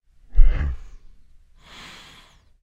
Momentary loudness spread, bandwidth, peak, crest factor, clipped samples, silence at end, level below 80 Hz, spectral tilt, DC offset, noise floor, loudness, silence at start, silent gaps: 23 LU; 4.5 kHz; 0 dBFS; 20 dB; under 0.1%; 1.85 s; -22 dBFS; -6 dB/octave; under 0.1%; -52 dBFS; -26 LUFS; 0.35 s; none